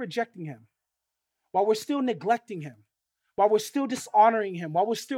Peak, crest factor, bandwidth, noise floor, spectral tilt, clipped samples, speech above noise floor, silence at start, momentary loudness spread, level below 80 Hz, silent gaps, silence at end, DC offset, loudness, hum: -8 dBFS; 18 dB; 16.5 kHz; -84 dBFS; -5 dB/octave; under 0.1%; 59 dB; 0 s; 18 LU; -80 dBFS; none; 0 s; under 0.1%; -26 LUFS; none